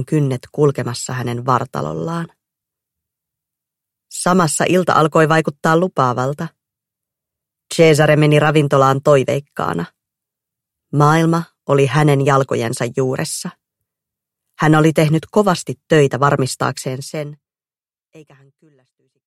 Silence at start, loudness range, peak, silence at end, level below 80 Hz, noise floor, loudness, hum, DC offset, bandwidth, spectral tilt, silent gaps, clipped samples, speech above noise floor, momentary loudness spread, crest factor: 0 s; 7 LU; 0 dBFS; 1.05 s; -54 dBFS; under -90 dBFS; -16 LUFS; none; under 0.1%; 15 kHz; -6 dB/octave; none; under 0.1%; over 75 dB; 13 LU; 16 dB